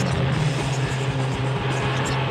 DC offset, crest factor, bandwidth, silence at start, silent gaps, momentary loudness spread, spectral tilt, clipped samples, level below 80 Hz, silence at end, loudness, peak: under 0.1%; 12 dB; 10.5 kHz; 0 s; none; 2 LU; -5.5 dB/octave; under 0.1%; -40 dBFS; 0 s; -23 LUFS; -10 dBFS